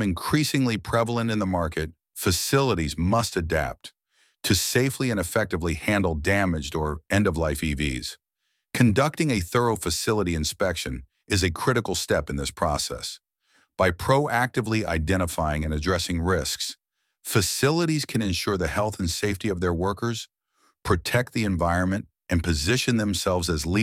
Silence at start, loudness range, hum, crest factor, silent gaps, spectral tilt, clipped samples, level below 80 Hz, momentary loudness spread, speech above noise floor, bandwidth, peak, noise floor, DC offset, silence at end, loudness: 0 s; 2 LU; none; 20 dB; none; -4.5 dB/octave; under 0.1%; -40 dBFS; 8 LU; 53 dB; 16.5 kHz; -6 dBFS; -77 dBFS; under 0.1%; 0 s; -25 LUFS